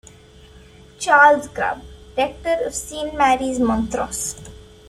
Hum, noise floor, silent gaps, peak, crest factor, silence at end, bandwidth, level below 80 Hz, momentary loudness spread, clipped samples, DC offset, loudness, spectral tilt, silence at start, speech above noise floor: none; -45 dBFS; none; -2 dBFS; 18 dB; 0.3 s; 15 kHz; -42 dBFS; 15 LU; under 0.1%; under 0.1%; -19 LUFS; -3 dB/octave; 1 s; 27 dB